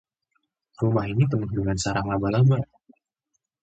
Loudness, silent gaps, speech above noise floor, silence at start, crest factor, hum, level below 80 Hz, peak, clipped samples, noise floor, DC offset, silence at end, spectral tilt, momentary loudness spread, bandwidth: -24 LUFS; none; 56 dB; 0.8 s; 16 dB; none; -46 dBFS; -10 dBFS; under 0.1%; -78 dBFS; under 0.1%; 1 s; -6.5 dB/octave; 6 LU; 8.8 kHz